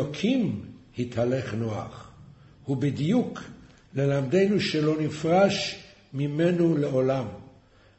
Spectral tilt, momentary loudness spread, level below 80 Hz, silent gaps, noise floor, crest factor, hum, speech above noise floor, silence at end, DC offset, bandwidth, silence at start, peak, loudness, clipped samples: -6.5 dB/octave; 18 LU; -58 dBFS; none; -56 dBFS; 18 dB; none; 31 dB; 0.55 s; under 0.1%; 8.4 kHz; 0 s; -8 dBFS; -26 LUFS; under 0.1%